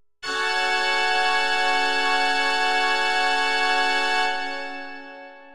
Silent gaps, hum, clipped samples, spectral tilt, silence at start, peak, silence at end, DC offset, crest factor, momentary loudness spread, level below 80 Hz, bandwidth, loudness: none; none; under 0.1%; 0 dB/octave; 0 s; -8 dBFS; 0 s; 2%; 14 dB; 11 LU; -68 dBFS; 15 kHz; -21 LUFS